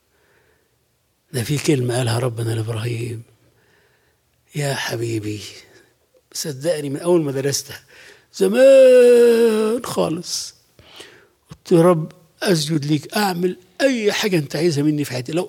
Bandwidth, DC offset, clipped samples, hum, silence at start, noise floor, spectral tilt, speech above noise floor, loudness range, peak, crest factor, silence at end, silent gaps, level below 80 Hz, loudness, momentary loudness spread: 16.5 kHz; under 0.1%; under 0.1%; none; 1.35 s; -65 dBFS; -5.5 dB/octave; 48 dB; 12 LU; -4 dBFS; 16 dB; 0 s; none; -62 dBFS; -18 LUFS; 18 LU